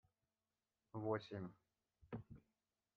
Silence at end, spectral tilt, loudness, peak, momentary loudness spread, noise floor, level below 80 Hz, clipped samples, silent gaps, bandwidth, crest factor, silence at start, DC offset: 0.55 s; -6.5 dB/octave; -49 LUFS; -28 dBFS; 16 LU; under -90 dBFS; -78 dBFS; under 0.1%; none; 6.2 kHz; 24 dB; 0.95 s; under 0.1%